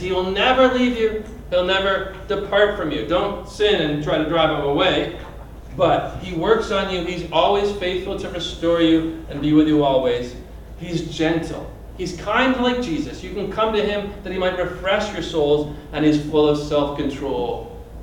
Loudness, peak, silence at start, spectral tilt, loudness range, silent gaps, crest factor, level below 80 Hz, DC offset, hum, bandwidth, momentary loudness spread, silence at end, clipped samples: -20 LUFS; -2 dBFS; 0 s; -5.5 dB/octave; 3 LU; none; 18 dB; -38 dBFS; under 0.1%; none; 16 kHz; 11 LU; 0 s; under 0.1%